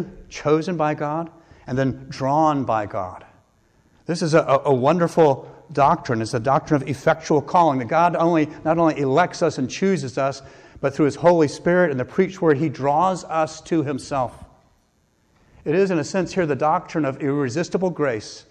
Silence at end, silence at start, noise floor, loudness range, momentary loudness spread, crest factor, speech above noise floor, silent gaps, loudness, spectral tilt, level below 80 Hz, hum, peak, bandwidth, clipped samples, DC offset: 0.1 s; 0 s; -63 dBFS; 5 LU; 10 LU; 14 dB; 43 dB; none; -21 LUFS; -6.5 dB/octave; -54 dBFS; none; -6 dBFS; 10.5 kHz; under 0.1%; under 0.1%